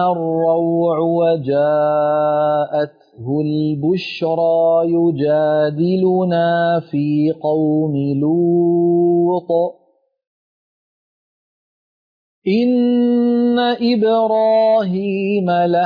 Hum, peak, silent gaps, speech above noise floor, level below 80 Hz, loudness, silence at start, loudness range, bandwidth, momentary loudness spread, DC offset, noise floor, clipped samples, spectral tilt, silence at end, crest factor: none; -6 dBFS; 10.27-12.42 s; over 75 dB; -64 dBFS; -16 LUFS; 0 s; 5 LU; 5.2 kHz; 5 LU; under 0.1%; under -90 dBFS; under 0.1%; -9.5 dB/octave; 0 s; 10 dB